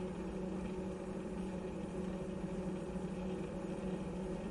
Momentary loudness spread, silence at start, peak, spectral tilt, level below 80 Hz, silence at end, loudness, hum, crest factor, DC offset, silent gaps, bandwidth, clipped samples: 1 LU; 0 s; -30 dBFS; -7.5 dB/octave; -54 dBFS; 0 s; -42 LUFS; none; 12 dB; under 0.1%; none; 11.5 kHz; under 0.1%